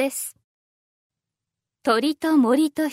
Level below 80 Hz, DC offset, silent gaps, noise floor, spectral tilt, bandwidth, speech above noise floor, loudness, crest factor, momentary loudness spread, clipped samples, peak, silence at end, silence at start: -74 dBFS; under 0.1%; 0.44-1.10 s; -86 dBFS; -3 dB/octave; 16 kHz; 65 dB; -21 LUFS; 18 dB; 12 LU; under 0.1%; -6 dBFS; 0 s; 0 s